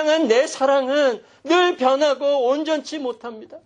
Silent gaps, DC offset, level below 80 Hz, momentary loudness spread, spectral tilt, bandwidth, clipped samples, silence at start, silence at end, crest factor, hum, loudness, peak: none; under 0.1%; -76 dBFS; 12 LU; -2.5 dB/octave; 10 kHz; under 0.1%; 0 s; 0.1 s; 14 dB; none; -19 LUFS; -6 dBFS